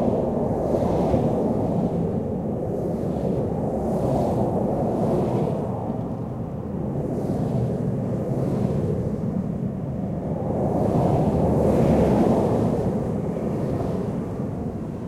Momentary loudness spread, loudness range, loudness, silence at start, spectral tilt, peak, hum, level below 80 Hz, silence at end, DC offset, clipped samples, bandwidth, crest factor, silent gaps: 8 LU; 4 LU; -24 LUFS; 0 s; -9.5 dB/octave; -8 dBFS; none; -40 dBFS; 0 s; under 0.1%; under 0.1%; 14 kHz; 16 dB; none